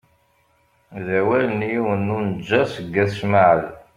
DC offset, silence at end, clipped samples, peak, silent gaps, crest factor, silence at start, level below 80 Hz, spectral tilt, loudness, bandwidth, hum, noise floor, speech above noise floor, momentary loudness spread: under 0.1%; 0.2 s; under 0.1%; -2 dBFS; none; 18 dB; 0.9 s; -56 dBFS; -7.5 dB/octave; -20 LUFS; 11.5 kHz; none; -61 dBFS; 42 dB; 8 LU